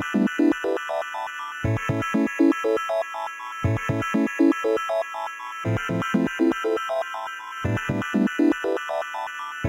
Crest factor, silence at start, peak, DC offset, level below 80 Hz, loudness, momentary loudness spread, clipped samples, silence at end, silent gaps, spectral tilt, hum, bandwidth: 16 dB; 0 s; -8 dBFS; under 0.1%; -50 dBFS; -25 LUFS; 10 LU; under 0.1%; 0 s; none; -6.5 dB/octave; none; 16 kHz